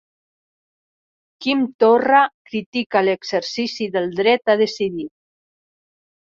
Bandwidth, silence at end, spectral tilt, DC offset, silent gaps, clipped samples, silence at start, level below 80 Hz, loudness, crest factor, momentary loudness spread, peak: 7.6 kHz; 1.2 s; -4.5 dB/octave; under 0.1%; 1.74-1.79 s, 2.34-2.45 s, 2.66-2.73 s, 2.86-2.90 s; under 0.1%; 1.4 s; -66 dBFS; -19 LUFS; 18 dB; 10 LU; -2 dBFS